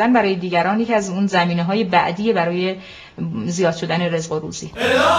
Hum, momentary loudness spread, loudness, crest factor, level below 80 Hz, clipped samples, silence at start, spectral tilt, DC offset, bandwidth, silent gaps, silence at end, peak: none; 9 LU; -19 LUFS; 18 dB; -54 dBFS; under 0.1%; 0 s; -5.5 dB/octave; under 0.1%; 12 kHz; none; 0 s; -2 dBFS